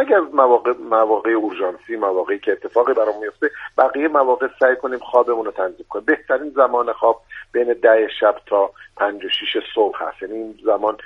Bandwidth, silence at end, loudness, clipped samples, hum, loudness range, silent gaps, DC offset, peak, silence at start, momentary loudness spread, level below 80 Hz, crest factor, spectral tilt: 5.6 kHz; 0 s; -18 LUFS; under 0.1%; none; 1 LU; none; under 0.1%; 0 dBFS; 0 s; 9 LU; -60 dBFS; 18 dB; -5 dB/octave